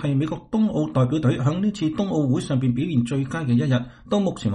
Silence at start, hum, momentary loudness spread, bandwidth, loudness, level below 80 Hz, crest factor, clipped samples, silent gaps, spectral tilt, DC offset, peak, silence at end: 0 s; none; 4 LU; 10 kHz; -23 LUFS; -52 dBFS; 14 dB; under 0.1%; none; -7.5 dB/octave; under 0.1%; -8 dBFS; 0 s